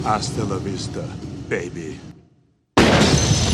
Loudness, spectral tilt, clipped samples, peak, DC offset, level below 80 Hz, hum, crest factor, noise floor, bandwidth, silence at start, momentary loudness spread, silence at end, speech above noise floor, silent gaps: -20 LUFS; -4.5 dB/octave; under 0.1%; 0 dBFS; under 0.1%; -34 dBFS; none; 20 dB; -59 dBFS; 13.5 kHz; 0 s; 18 LU; 0 s; 34 dB; none